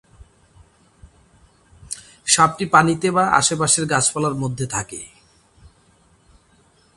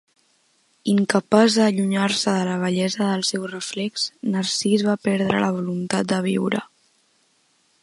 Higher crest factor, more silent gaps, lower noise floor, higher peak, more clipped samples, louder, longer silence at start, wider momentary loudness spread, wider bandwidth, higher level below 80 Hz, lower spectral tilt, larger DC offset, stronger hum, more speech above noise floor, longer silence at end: about the same, 22 dB vs 20 dB; neither; second, -57 dBFS vs -63 dBFS; about the same, 0 dBFS vs -2 dBFS; neither; first, -17 LUFS vs -21 LUFS; first, 1.9 s vs 0.85 s; first, 18 LU vs 9 LU; about the same, 11.5 kHz vs 11.5 kHz; first, -52 dBFS vs -66 dBFS; second, -3 dB/octave vs -4.5 dB/octave; neither; neither; second, 38 dB vs 43 dB; first, 1.9 s vs 1.15 s